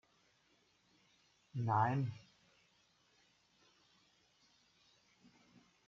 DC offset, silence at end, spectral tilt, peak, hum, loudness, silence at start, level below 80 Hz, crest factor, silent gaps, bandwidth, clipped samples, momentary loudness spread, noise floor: under 0.1%; 3.7 s; -7 dB/octave; -20 dBFS; none; -38 LUFS; 1.55 s; -84 dBFS; 24 dB; none; 7.2 kHz; under 0.1%; 16 LU; -75 dBFS